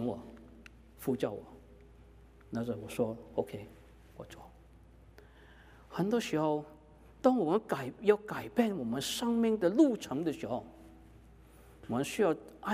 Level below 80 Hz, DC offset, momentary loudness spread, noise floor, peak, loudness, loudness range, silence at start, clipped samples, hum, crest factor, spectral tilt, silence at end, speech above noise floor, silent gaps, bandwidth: -62 dBFS; under 0.1%; 22 LU; -58 dBFS; -12 dBFS; -33 LUFS; 10 LU; 0 s; under 0.1%; none; 22 dB; -5.5 dB/octave; 0 s; 25 dB; none; 15.5 kHz